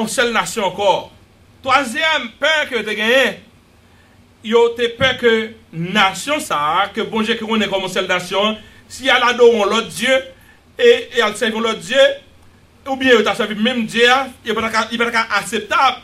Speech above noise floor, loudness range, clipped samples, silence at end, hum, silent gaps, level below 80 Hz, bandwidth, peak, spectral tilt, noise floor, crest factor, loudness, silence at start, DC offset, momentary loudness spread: 33 dB; 2 LU; under 0.1%; 0.05 s; none; none; -52 dBFS; 15.5 kHz; 0 dBFS; -3 dB/octave; -49 dBFS; 16 dB; -16 LUFS; 0 s; under 0.1%; 8 LU